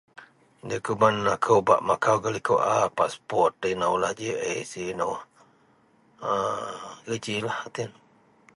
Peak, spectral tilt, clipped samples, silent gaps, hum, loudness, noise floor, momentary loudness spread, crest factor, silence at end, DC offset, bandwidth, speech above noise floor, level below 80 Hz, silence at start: -4 dBFS; -4.5 dB/octave; under 0.1%; none; none; -26 LUFS; -61 dBFS; 13 LU; 22 dB; 0.65 s; under 0.1%; 11.5 kHz; 36 dB; -62 dBFS; 0.15 s